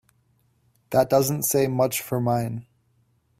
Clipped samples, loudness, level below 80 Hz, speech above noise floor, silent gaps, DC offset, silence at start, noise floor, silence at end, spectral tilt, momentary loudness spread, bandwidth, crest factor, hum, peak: under 0.1%; -23 LUFS; -60 dBFS; 43 dB; none; under 0.1%; 0.9 s; -66 dBFS; 0.8 s; -5 dB/octave; 7 LU; 16 kHz; 18 dB; none; -6 dBFS